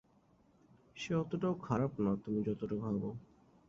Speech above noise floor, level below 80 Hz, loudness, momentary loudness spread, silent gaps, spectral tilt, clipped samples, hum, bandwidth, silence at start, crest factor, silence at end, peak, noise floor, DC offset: 33 dB; -66 dBFS; -37 LUFS; 11 LU; none; -7.5 dB/octave; under 0.1%; none; 7.6 kHz; 0.95 s; 18 dB; 0.5 s; -20 dBFS; -69 dBFS; under 0.1%